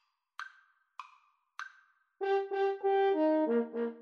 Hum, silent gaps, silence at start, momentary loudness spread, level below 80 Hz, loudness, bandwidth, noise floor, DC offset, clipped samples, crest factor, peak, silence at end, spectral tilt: none; none; 0.4 s; 23 LU; under -90 dBFS; -31 LUFS; 6.6 kHz; -67 dBFS; under 0.1%; under 0.1%; 14 dB; -20 dBFS; 0 s; -5.5 dB/octave